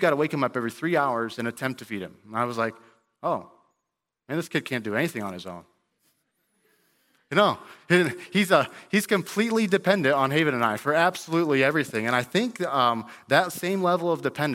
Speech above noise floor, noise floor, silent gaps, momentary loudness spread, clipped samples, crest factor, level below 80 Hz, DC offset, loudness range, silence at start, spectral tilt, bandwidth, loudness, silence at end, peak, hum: 58 dB; -83 dBFS; none; 11 LU; under 0.1%; 22 dB; -74 dBFS; under 0.1%; 9 LU; 0 s; -5 dB/octave; 17 kHz; -25 LUFS; 0 s; -4 dBFS; none